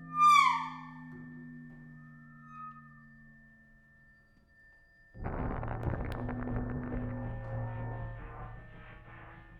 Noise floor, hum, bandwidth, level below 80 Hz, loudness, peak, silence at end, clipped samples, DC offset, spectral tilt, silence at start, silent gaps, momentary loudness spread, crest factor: -63 dBFS; none; 13 kHz; -48 dBFS; -32 LUFS; -12 dBFS; 0 s; under 0.1%; under 0.1%; -5 dB/octave; 0 s; none; 25 LU; 24 dB